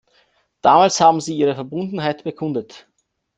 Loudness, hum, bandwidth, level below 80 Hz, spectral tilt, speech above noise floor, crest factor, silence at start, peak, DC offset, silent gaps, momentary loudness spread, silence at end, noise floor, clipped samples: -18 LUFS; none; 9.4 kHz; -62 dBFS; -4.5 dB/octave; 43 dB; 18 dB; 0.65 s; -2 dBFS; under 0.1%; none; 13 LU; 0.6 s; -61 dBFS; under 0.1%